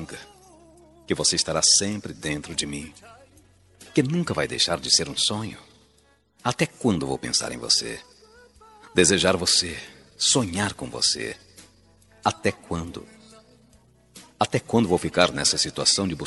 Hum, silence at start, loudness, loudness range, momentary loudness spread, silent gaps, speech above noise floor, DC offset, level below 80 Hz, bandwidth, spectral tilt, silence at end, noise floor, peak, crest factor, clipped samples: none; 0 s; -22 LUFS; 6 LU; 16 LU; none; 37 dB; under 0.1%; -54 dBFS; 12 kHz; -2.5 dB/octave; 0 s; -61 dBFS; -2 dBFS; 24 dB; under 0.1%